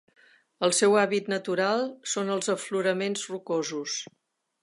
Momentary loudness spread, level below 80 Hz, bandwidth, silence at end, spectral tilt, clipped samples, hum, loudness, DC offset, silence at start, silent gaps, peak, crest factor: 11 LU; -82 dBFS; 11.5 kHz; 0.6 s; -3 dB/octave; under 0.1%; none; -27 LUFS; under 0.1%; 0.6 s; none; -8 dBFS; 20 dB